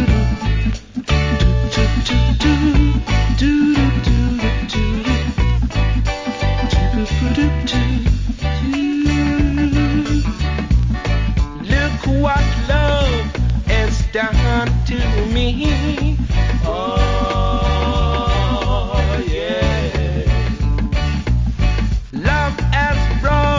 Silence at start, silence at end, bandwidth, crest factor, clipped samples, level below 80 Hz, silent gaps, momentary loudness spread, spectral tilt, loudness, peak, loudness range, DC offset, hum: 0 s; 0 s; 7.6 kHz; 14 dB; under 0.1%; -18 dBFS; none; 4 LU; -6.5 dB/octave; -17 LUFS; -2 dBFS; 2 LU; under 0.1%; none